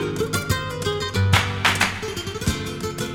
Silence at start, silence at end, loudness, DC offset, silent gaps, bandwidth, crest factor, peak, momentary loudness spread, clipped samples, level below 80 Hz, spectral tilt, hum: 0 s; 0 s; -22 LUFS; under 0.1%; none; 17.5 kHz; 22 dB; -2 dBFS; 9 LU; under 0.1%; -40 dBFS; -4 dB/octave; none